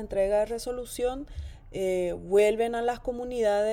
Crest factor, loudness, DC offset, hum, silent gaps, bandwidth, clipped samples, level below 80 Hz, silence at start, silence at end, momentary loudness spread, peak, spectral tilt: 16 dB; -28 LUFS; under 0.1%; none; none; 16.5 kHz; under 0.1%; -46 dBFS; 0 s; 0 s; 14 LU; -12 dBFS; -5 dB/octave